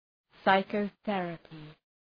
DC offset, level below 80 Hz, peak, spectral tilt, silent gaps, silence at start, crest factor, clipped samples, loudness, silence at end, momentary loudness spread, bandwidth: under 0.1%; -70 dBFS; -10 dBFS; -8 dB/octave; none; 0.45 s; 22 dB; under 0.1%; -30 LUFS; 0.4 s; 21 LU; 5.2 kHz